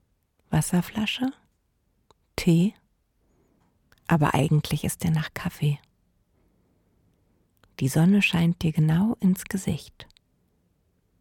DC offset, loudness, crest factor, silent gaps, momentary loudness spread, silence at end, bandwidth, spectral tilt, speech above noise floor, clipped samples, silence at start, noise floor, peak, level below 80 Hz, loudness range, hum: under 0.1%; -24 LUFS; 18 dB; none; 11 LU; 1.15 s; 17.5 kHz; -6 dB/octave; 47 dB; under 0.1%; 0.5 s; -70 dBFS; -8 dBFS; -52 dBFS; 5 LU; none